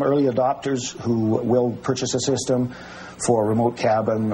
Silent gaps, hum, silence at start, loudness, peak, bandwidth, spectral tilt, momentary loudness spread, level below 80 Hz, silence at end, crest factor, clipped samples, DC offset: none; none; 0 s; -22 LUFS; -4 dBFS; 15.5 kHz; -5.5 dB/octave; 6 LU; -56 dBFS; 0 s; 16 dB; under 0.1%; under 0.1%